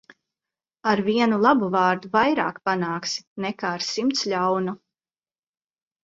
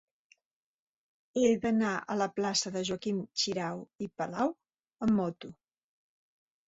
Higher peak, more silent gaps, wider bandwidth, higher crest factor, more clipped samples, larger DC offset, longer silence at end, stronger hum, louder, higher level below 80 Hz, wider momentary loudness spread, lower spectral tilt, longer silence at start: first, -4 dBFS vs -14 dBFS; about the same, 3.27-3.36 s vs 3.95-3.99 s; about the same, 7.8 kHz vs 8 kHz; about the same, 20 dB vs 20 dB; neither; neither; first, 1.3 s vs 1.15 s; neither; first, -23 LUFS vs -32 LUFS; about the same, -66 dBFS vs -68 dBFS; about the same, 10 LU vs 12 LU; about the same, -4.5 dB/octave vs -4 dB/octave; second, 0.85 s vs 1.35 s